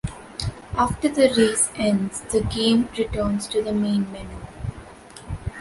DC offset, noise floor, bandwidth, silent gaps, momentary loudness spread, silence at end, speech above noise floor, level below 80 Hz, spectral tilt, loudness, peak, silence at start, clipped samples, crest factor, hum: under 0.1%; -42 dBFS; 11.5 kHz; none; 17 LU; 0 s; 21 dB; -40 dBFS; -4.5 dB/octave; -22 LUFS; -4 dBFS; 0.05 s; under 0.1%; 20 dB; none